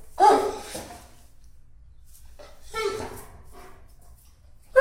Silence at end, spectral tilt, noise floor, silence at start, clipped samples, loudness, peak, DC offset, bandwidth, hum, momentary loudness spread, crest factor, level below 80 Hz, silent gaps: 0 s; -3.5 dB/octave; -51 dBFS; 0 s; under 0.1%; -25 LUFS; -4 dBFS; under 0.1%; 16 kHz; none; 30 LU; 22 dB; -50 dBFS; none